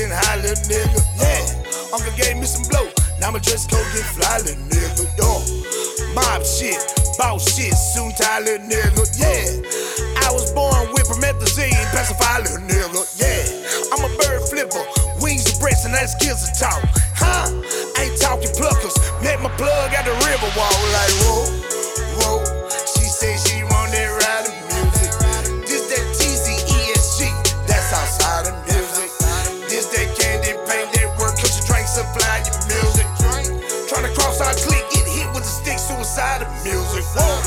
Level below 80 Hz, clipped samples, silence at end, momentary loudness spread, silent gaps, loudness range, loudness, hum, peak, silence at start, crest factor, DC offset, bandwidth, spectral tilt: -24 dBFS; under 0.1%; 0 s; 5 LU; none; 2 LU; -18 LUFS; none; 0 dBFS; 0 s; 18 dB; under 0.1%; 17.5 kHz; -3 dB/octave